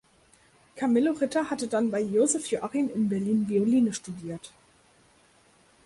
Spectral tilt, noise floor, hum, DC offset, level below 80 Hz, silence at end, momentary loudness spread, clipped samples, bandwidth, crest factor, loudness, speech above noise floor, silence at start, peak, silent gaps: -5 dB/octave; -61 dBFS; none; under 0.1%; -68 dBFS; 1.35 s; 12 LU; under 0.1%; 11.5 kHz; 14 dB; -26 LUFS; 35 dB; 0.75 s; -12 dBFS; none